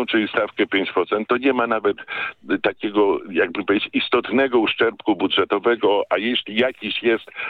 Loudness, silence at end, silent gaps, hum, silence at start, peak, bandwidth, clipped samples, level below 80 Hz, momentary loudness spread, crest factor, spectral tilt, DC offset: -20 LUFS; 0 s; none; none; 0 s; -2 dBFS; 4.8 kHz; under 0.1%; -64 dBFS; 4 LU; 18 dB; -7 dB/octave; under 0.1%